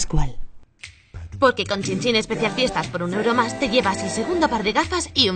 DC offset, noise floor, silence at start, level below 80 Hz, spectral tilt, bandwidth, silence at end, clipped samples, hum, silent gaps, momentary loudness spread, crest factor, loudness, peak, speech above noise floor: under 0.1%; -45 dBFS; 0 s; -34 dBFS; -4 dB/octave; 9.4 kHz; 0 s; under 0.1%; none; none; 19 LU; 18 dB; -21 LUFS; -2 dBFS; 24 dB